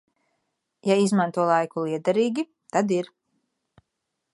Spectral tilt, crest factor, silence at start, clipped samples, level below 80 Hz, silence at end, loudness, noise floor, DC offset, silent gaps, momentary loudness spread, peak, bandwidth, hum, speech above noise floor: -6 dB/octave; 18 dB; 0.85 s; under 0.1%; -76 dBFS; 1.3 s; -24 LUFS; -81 dBFS; under 0.1%; none; 9 LU; -6 dBFS; 11.5 kHz; none; 58 dB